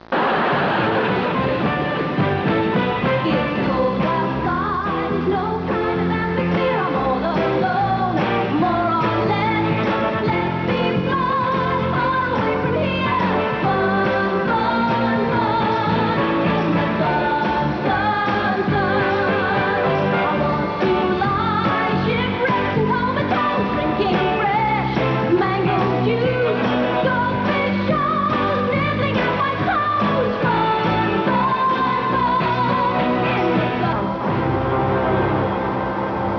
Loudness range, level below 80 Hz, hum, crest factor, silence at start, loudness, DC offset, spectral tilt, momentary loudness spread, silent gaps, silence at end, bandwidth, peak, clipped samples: 1 LU; -42 dBFS; none; 12 dB; 0.1 s; -19 LUFS; under 0.1%; -8 dB/octave; 2 LU; none; 0 s; 5.4 kHz; -6 dBFS; under 0.1%